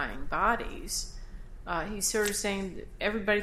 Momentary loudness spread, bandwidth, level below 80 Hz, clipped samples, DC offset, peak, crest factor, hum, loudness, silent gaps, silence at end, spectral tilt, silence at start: 15 LU; 16 kHz; -42 dBFS; under 0.1%; under 0.1%; -12 dBFS; 18 dB; none; -31 LUFS; none; 0 s; -2.5 dB/octave; 0 s